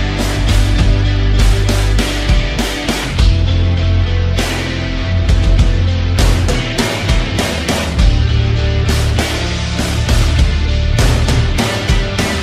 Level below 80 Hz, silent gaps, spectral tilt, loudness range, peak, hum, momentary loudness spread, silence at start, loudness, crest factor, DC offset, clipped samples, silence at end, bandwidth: -16 dBFS; none; -5 dB/octave; 1 LU; 0 dBFS; none; 4 LU; 0 s; -14 LUFS; 12 dB; under 0.1%; under 0.1%; 0 s; 15 kHz